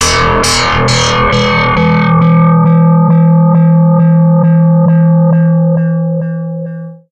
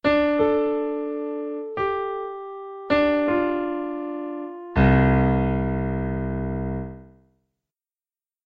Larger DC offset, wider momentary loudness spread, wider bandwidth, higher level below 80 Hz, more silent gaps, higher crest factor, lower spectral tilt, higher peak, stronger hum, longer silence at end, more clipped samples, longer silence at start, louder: neither; second, 8 LU vs 14 LU; first, 10.5 kHz vs 5.2 kHz; first, -30 dBFS vs -36 dBFS; neither; second, 8 dB vs 18 dB; second, -6 dB/octave vs -9.5 dB/octave; first, 0 dBFS vs -6 dBFS; neither; second, 0.15 s vs 1.4 s; neither; about the same, 0 s vs 0.05 s; first, -8 LUFS vs -24 LUFS